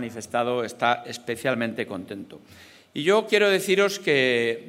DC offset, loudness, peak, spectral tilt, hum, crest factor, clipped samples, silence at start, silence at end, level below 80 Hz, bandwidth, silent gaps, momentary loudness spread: under 0.1%; -23 LUFS; -6 dBFS; -4 dB/octave; none; 18 dB; under 0.1%; 0 s; 0 s; -72 dBFS; 16 kHz; none; 15 LU